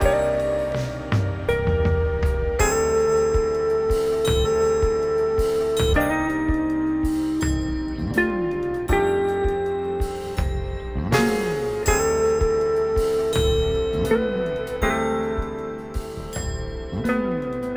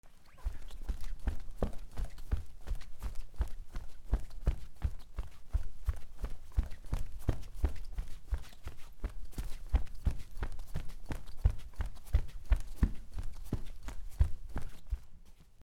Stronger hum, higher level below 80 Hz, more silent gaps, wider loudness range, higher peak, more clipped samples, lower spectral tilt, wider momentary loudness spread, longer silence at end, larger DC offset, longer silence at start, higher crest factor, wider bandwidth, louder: neither; first, -30 dBFS vs -38 dBFS; neither; about the same, 3 LU vs 4 LU; first, -4 dBFS vs -14 dBFS; neither; second, -5.5 dB/octave vs -7 dB/octave; second, 7 LU vs 11 LU; about the same, 0 s vs 0 s; neither; about the same, 0 s vs 0.05 s; about the same, 16 dB vs 20 dB; first, over 20 kHz vs 14.5 kHz; first, -23 LUFS vs -41 LUFS